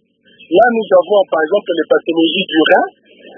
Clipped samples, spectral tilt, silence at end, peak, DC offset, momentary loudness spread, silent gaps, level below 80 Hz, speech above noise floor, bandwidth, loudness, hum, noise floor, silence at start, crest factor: under 0.1%; -7 dB/octave; 0.5 s; 0 dBFS; under 0.1%; 5 LU; none; -58 dBFS; 34 dB; 3.7 kHz; -13 LUFS; none; -46 dBFS; 0.5 s; 14 dB